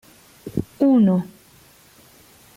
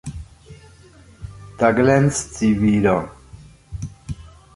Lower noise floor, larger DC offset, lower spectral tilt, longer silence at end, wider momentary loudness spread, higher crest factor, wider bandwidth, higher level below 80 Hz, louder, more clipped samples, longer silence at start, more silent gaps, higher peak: first, -51 dBFS vs -47 dBFS; neither; first, -9 dB/octave vs -6.5 dB/octave; first, 1.3 s vs 0.3 s; about the same, 21 LU vs 23 LU; about the same, 16 dB vs 20 dB; first, 16 kHz vs 11.5 kHz; second, -54 dBFS vs -42 dBFS; about the same, -19 LUFS vs -18 LUFS; neither; first, 0.45 s vs 0.05 s; neither; second, -6 dBFS vs -2 dBFS